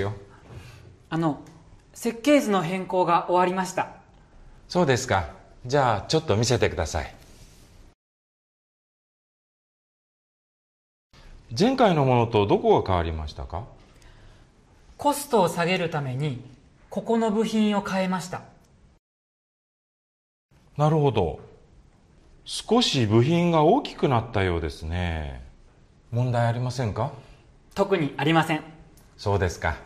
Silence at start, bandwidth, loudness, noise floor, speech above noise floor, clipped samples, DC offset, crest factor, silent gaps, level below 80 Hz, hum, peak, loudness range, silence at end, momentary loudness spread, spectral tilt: 0 s; 14 kHz; -24 LUFS; -55 dBFS; 32 dB; under 0.1%; under 0.1%; 18 dB; 7.95-11.10 s, 18.99-20.49 s; -48 dBFS; none; -6 dBFS; 6 LU; 0 s; 16 LU; -6 dB/octave